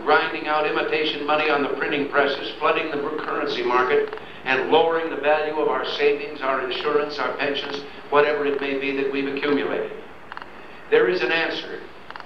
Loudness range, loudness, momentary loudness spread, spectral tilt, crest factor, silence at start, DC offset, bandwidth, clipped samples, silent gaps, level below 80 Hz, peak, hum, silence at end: 2 LU; -22 LUFS; 12 LU; -5 dB/octave; 20 dB; 0 s; 0.7%; 6.6 kHz; under 0.1%; none; -60 dBFS; -4 dBFS; none; 0 s